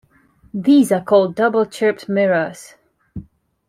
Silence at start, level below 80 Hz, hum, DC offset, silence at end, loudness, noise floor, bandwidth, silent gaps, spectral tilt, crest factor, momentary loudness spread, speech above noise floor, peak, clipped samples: 0.55 s; -56 dBFS; none; under 0.1%; 0.5 s; -16 LUFS; -53 dBFS; 15 kHz; none; -6 dB/octave; 16 dB; 23 LU; 37 dB; -2 dBFS; under 0.1%